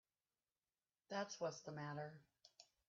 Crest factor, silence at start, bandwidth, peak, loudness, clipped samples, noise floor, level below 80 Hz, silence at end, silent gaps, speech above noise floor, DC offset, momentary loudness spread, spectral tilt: 20 dB; 1.1 s; 7.4 kHz; -34 dBFS; -49 LUFS; under 0.1%; under -90 dBFS; under -90 dBFS; 0.25 s; none; over 41 dB; under 0.1%; 20 LU; -4 dB/octave